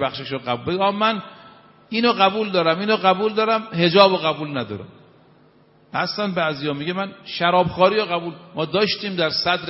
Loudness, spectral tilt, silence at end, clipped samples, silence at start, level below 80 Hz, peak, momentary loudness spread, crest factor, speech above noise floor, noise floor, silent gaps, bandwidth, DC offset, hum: -20 LUFS; -8 dB/octave; 0 s; under 0.1%; 0 s; -60 dBFS; 0 dBFS; 11 LU; 20 dB; 34 dB; -54 dBFS; none; 6 kHz; under 0.1%; none